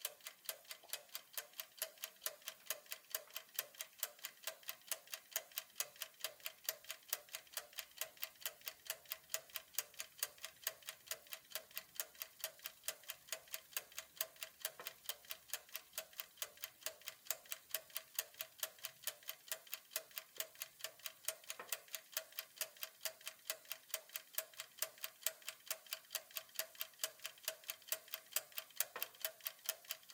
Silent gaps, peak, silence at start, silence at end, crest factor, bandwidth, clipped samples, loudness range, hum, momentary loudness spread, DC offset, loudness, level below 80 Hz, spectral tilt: none; -14 dBFS; 0 s; 0 s; 36 dB; 18 kHz; under 0.1%; 2 LU; none; 5 LU; under 0.1%; -46 LUFS; under -90 dBFS; 2.5 dB/octave